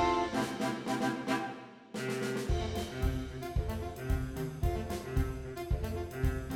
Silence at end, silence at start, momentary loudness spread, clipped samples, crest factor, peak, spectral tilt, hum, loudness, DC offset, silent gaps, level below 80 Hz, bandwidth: 0 s; 0 s; 6 LU; under 0.1%; 16 dB; -18 dBFS; -6 dB/octave; none; -36 LUFS; under 0.1%; none; -40 dBFS; 18 kHz